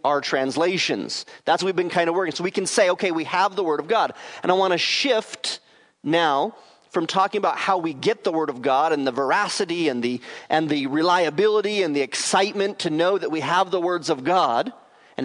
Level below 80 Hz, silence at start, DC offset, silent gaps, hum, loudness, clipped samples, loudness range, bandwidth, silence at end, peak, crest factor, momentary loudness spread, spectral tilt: -76 dBFS; 0.05 s; under 0.1%; none; none; -22 LUFS; under 0.1%; 1 LU; 11 kHz; 0 s; -4 dBFS; 18 dB; 7 LU; -3.5 dB/octave